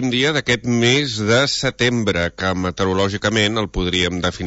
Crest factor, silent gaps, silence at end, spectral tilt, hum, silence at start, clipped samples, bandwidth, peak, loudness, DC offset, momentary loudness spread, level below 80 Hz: 16 dB; none; 0 s; -4.5 dB/octave; none; 0 s; under 0.1%; 8 kHz; -4 dBFS; -18 LUFS; under 0.1%; 5 LU; -40 dBFS